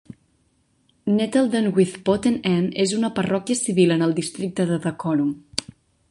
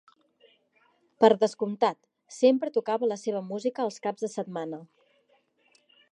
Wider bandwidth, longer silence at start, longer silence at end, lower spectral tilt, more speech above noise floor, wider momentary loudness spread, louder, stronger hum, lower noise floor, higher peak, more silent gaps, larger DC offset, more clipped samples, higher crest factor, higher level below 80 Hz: about the same, 11.5 kHz vs 10.5 kHz; second, 1.05 s vs 1.2 s; second, 0.5 s vs 1.25 s; about the same, -5.5 dB/octave vs -5.5 dB/octave; about the same, 44 dB vs 41 dB; second, 7 LU vs 14 LU; first, -22 LUFS vs -27 LUFS; neither; second, -64 dBFS vs -68 dBFS; first, -2 dBFS vs -6 dBFS; neither; neither; neither; about the same, 20 dB vs 22 dB; first, -58 dBFS vs -86 dBFS